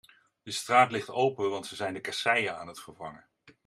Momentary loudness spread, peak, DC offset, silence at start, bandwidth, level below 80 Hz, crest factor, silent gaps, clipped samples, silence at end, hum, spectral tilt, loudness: 20 LU; -8 dBFS; under 0.1%; 0.45 s; 14 kHz; -74 dBFS; 22 dB; none; under 0.1%; 0.15 s; none; -3.5 dB/octave; -28 LUFS